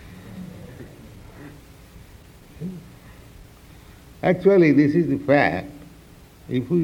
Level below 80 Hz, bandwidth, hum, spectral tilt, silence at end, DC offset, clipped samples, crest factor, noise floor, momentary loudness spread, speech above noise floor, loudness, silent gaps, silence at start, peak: -50 dBFS; 16 kHz; none; -8 dB/octave; 0 s; under 0.1%; under 0.1%; 20 dB; -47 dBFS; 27 LU; 29 dB; -19 LUFS; none; 0.05 s; -4 dBFS